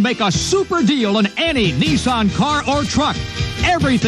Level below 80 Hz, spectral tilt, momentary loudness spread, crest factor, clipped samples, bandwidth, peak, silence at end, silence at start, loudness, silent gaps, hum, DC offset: -34 dBFS; -4.5 dB/octave; 3 LU; 12 dB; under 0.1%; 12.5 kHz; -4 dBFS; 0 s; 0 s; -16 LUFS; none; none; under 0.1%